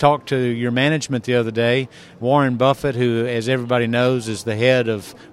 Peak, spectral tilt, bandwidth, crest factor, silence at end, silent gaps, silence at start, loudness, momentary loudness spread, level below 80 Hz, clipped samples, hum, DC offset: 0 dBFS; -6 dB/octave; 14 kHz; 18 dB; 0.05 s; none; 0 s; -19 LUFS; 6 LU; -52 dBFS; under 0.1%; none; under 0.1%